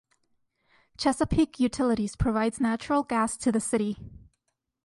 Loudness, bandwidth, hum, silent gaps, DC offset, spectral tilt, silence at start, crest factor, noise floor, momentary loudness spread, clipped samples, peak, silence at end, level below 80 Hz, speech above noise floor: -27 LUFS; 11.5 kHz; none; none; under 0.1%; -5 dB/octave; 1 s; 18 dB; -79 dBFS; 4 LU; under 0.1%; -10 dBFS; 0.7 s; -46 dBFS; 52 dB